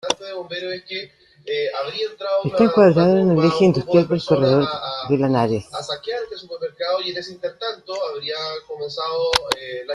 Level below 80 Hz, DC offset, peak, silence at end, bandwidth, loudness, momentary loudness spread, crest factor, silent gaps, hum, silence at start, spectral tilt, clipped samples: -54 dBFS; under 0.1%; -2 dBFS; 0 s; 13 kHz; -20 LUFS; 14 LU; 18 dB; none; none; 0.05 s; -6 dB/octave; under 0.1%